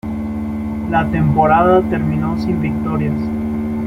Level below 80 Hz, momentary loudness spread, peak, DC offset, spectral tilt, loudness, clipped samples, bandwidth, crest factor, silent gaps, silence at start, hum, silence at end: -34 dBFS; 11 LU; -2 dBFS; under 0.1%; -9.5 dB/octave; -17 LUFS; under 0.1%; 6.2 kHz; 14 dB; none; 0.05 s; none; 0 s